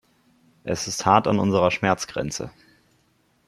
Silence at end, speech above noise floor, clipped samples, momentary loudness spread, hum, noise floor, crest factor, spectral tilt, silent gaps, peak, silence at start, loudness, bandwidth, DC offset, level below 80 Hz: 1 s; 43 dB; under 0.1%; 14 LU; none; -64 dBFS; 22 dB; -4.5 dB/octave; none; -2 dBFS; 0.65 s; -22 LUFS; 15 kHz; under 0.1%; -56 dBFS